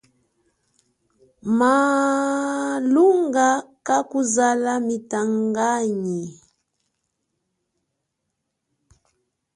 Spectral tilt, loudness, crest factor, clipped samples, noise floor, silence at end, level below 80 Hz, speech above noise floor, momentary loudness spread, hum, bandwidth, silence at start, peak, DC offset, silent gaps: -4.5 dB/octave; -20 LUFS; 18 dB; under 0.1%; -78 dBFS; 3.2 s; -68 dBFS; 58 dB; 9 LU; none; 11.5 kHz; 1.45 s; -6 dBFS; under 0.1%; none